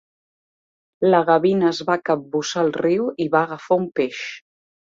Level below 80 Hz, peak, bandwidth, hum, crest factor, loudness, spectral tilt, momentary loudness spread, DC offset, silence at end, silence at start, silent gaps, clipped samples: -66 dBFS; -2 dBFS; 7.8 kHz; none; 18 dB; -20 LUFS; -5.5 dB/octave; 8 LU; under 0.1%; 0.55 s; 1 s; none; under 0.1%